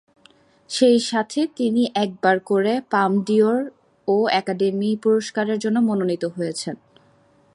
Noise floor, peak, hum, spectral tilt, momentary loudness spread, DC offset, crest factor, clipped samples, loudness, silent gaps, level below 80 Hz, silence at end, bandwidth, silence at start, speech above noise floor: -57 dBFS; -4 dBFS; none; -5 dB/octave; 9 LU; under 0.1%; 18 dB; under 0.1%; -21 LUFS; none; -70 dBFS; 0.8 s; 11.5 kHz; 0.7 s; 37 dB